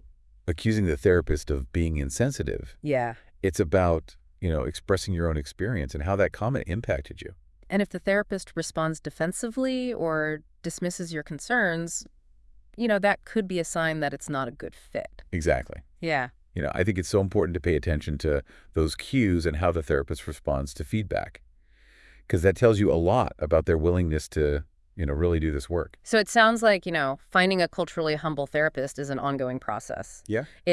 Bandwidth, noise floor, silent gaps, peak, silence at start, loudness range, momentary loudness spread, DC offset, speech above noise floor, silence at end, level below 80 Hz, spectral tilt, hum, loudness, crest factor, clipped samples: 12 kHz; -57 dBFS; none; -6 dBFS; 0.45 s; 5 LU; 11 LU; under 0.1%; 31 dB; 0 s; -42 dBFS; -5.5 dB/octave; none; -27 LUFS; 20 dB; under 0.1%